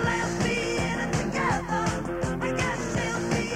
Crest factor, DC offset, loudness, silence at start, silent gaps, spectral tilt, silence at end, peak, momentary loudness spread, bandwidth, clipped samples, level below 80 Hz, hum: 14 dB; under 0.1%; -27 LUFS; 0 s; none; -5 dB/octave; 0 s; -12 dBFS; 3 LU; 15.5 kHz; under 0.1%; -42 dBFS; none